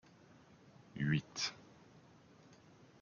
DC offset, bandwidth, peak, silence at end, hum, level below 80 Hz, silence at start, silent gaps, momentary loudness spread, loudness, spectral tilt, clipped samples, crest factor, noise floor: under 0.1%; 7.2 kHz; -22 dBFS; 0.5 s; none; -74 dBFS; 0.95 s; none; 26 LU; -39 LUFS; -4.5 dB/octave; under 0.1%; 22 dB; -63 dBFS